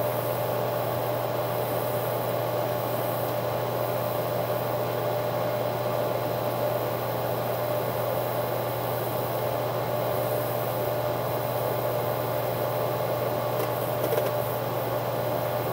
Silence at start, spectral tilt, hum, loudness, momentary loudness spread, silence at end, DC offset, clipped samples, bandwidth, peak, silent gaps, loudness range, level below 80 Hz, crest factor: 0 s; -5.5 dB/octave; none; -28 LUFS; 1 LU; 0 s; under 0.1%; under 0.1%; 16 kHz; -12 dBFS; none; 0 LU; -60 dBFS; 16 dB